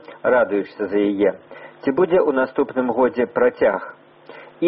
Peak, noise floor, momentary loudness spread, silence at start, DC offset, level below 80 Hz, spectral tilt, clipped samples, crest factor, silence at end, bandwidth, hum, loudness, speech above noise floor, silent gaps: -6 dBFS; -43 dBFS; 7 LU; 0.1 s; under 0.1%; -58 dBFS; -5 dB/octave; under 0.1%; 14 dB; 0 s; 5.6 kHz; none; -20 LUFS; 24 dB; none